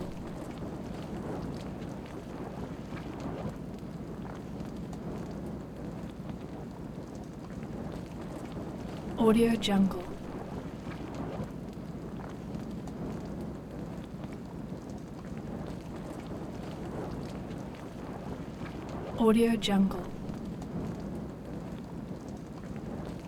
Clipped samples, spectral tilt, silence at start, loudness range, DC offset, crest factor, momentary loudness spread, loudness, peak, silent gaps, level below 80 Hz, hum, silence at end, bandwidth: under 0.1%; -6.5 dB/octave; 0 s; 10 LU; under 0.1%; 22 dB; 14 LU; -36 LUFS; -12 dBFS; none; -50 dBFS; none; 0 s; 16.5 kHz